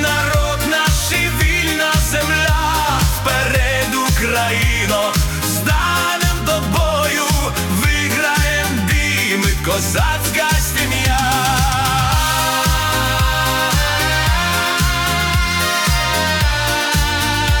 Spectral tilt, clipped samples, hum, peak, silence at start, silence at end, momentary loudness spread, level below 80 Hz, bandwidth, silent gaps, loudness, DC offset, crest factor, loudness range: -3.5 dB/octave; under 0.1%; none; -4 dBFS; 0 s; 0 s; 2 LU; -22 dBFS; 19 kHz; none; -15 LUFS; under 0.1%; 12 dB; 1 LU